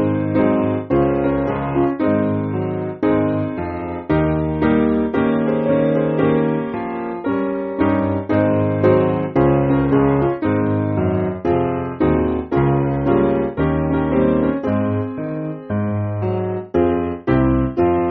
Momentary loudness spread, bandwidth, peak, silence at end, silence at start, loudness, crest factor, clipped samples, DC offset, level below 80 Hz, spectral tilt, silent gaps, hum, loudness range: 6 LU; 4.4 kHz; -2 dBFS; 0 s; 0 s; -18 LUFS; 14 dB; under 0.1%; under 0.1%; -36 dBFS; -8.5 dB/octave; none; none; 3 LU